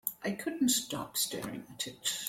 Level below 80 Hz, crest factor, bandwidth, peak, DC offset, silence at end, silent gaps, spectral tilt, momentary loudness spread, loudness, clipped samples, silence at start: -70 dBFS; 20 dB; 16.5 kHz; -16 dBFS; under 0.1%; 0 s; none; -2 dB/octave; 11 LU; -33 LUFS; under 0.1%; 0.05 s